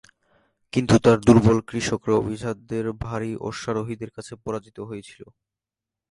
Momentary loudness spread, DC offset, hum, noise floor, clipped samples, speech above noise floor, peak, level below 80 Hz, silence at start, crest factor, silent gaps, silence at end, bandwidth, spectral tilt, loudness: 20 LU; under 0.1%; none; -89 dBFS; under 0.1%; 66 dB; 0 dBFS; -46 dBFS; 0.75 s; 22 dB; none; 0.9 s; 11.5 kHz; -6.5 dB/octave; -22 LUFS